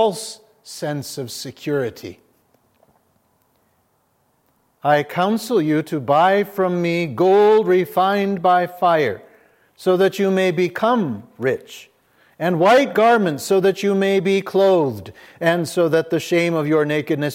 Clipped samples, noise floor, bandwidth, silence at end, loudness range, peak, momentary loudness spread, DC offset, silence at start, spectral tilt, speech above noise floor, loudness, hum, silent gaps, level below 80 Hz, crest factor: under 0.1%; -64 dBFS; 16.5 kHz; 0 s; 12 LU; -2 dBFS; 14 LU; under 0.1%; 0 s; -5.5 dB/octave; 46 dB; -18 LUFS; none; none; -70 dBFS; 16 dB